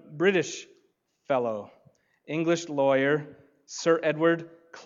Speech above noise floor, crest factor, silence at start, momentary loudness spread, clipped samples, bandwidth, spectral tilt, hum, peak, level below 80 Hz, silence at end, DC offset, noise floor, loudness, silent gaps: 44 dB; 20 dB; 0.1 s; 16 LU; under 0.1%; 7.6 kHz; -5 dB/octave; none; -8 dBFS; -82 dBFS; 0 s; under 0.1%; -70 dBFS; -26 LUFS; none